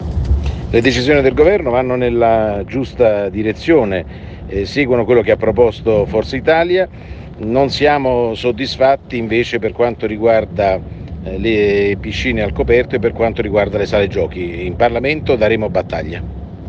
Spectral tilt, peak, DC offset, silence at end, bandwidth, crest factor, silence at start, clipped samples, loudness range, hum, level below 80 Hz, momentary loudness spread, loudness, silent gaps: -7 dB/octave; 0 dBFS; under 0.1%; 0 s; 8 kHz; 14 dB; 0 s; under 0.1%; 2 LU; none; -30 dBFS; 10 LU; -15 LUFS; none